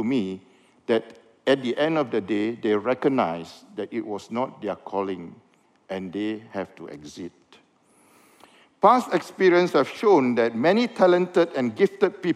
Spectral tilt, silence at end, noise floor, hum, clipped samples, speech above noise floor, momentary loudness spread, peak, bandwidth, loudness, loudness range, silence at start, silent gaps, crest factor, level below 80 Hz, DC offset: -6 dB/octave; 0 s; -60 dBFS; none; under 0.1%; 37 dB; 18 LU; -4 dBFS; 12.5 kHz; -23 LUFS; 13 LU; 0 s; none; 20 dB; -74 dBFS; under 0.1%